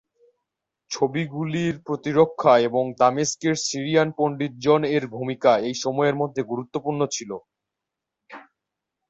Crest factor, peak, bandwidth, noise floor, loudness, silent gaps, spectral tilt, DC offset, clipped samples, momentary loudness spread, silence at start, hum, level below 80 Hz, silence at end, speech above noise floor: 20 dB; -4 dBFS; 8.2 kHz; -85 dBFS; -22 LUFS; none; -5 dB/octave; under 0.1%; under 0.1%; 10 LU; 0.9 s; none; -64 dBFS; 0.7 s; 63 dB